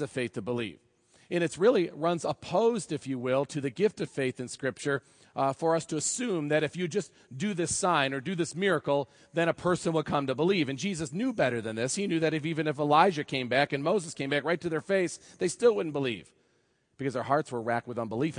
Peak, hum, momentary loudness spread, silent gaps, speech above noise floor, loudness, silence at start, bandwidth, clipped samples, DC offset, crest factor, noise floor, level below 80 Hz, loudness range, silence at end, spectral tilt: -8 dBFS; none; 8 LU; none; 42 dB; -29 LUFS; 0 s; 10.5 kHz; under 0.1%; under 0.1%; 22 dB; -71 dBFS; -68 dBFS; 3 LU; 0 s; -4.5 dB/octave